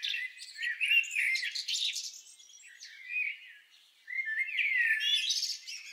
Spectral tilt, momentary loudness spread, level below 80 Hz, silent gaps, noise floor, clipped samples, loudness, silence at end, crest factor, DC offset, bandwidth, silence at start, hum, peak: 9 dB/octave; 17 LU; under -90 dBFS; none; -61 dBFS; under 0.1%; -30 LUFS; 0 s; 18 dB; under 0.1%; 16 kHz; 0 s; none; -16 dBFS